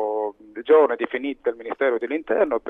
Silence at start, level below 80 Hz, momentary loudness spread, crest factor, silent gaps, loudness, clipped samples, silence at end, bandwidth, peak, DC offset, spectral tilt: 0 s; -62 dBFS; 11 LU; 16 dB; none; -22 LUFS; under 0.1%; 0 s; 3.9 kHz; -6 dBFS; under 0.1%; -6.5 dB/octave